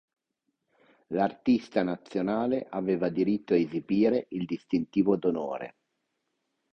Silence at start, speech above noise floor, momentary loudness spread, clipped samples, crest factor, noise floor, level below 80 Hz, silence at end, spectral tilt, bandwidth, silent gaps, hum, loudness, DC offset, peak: 1.1 s; 53 dB; 9 LU; under 0.1%; 18 dB; -81 dBFS; -66 dBFS; 1 s; -8.5 dB/octave; 6.4 kHz; none; none; -28 LUFS; under 0.1%; -12 dBFS